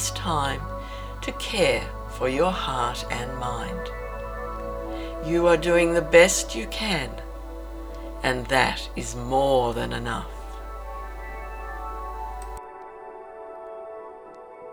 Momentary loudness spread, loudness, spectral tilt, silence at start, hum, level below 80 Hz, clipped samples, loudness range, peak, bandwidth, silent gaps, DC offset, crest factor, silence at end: 19 LU; -25 LUFS; -4 dB/octave; 0 s; none; -38 dBFS; under 0.1%; 15 LU; -2 dBFS; over 20 kHz; none; under 0.1%; 24 dB; 0 s